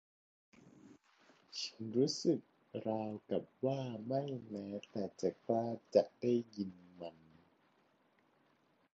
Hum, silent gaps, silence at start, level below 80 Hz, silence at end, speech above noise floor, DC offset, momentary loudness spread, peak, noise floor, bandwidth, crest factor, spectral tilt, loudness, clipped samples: none; none; 0.65 s; -80 dBFS; 1.85 s; 36 dB; under 0.1%; 13 LU; -16 dBFS; -74 dBFS; 7.6 kHz; 24 dB; -6 dB/octave; -39 LUFS; under 0.1%